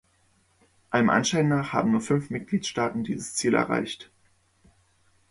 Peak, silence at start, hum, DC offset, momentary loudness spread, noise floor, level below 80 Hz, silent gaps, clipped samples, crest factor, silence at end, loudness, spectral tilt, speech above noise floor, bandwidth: -6 dBFS; 0.9 s; none; under 0.1%; 8 LU; -65 dBFS; -62 dBFS; none; under 0.1%; 20 dB; 1.25 s; -25 LUFS; -5 dB/octave; 40 dB; 11.5 kHz